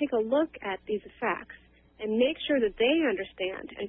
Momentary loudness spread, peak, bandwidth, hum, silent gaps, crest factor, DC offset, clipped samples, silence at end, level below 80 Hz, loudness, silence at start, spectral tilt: 11 LU; -12 dBFS; 3.9 kHz; none; none; 16 dB; under 0.1%; under 0.1%; 0 s; -60 dBFS; -29 LUFS; 0 s; -8.5 dB/octave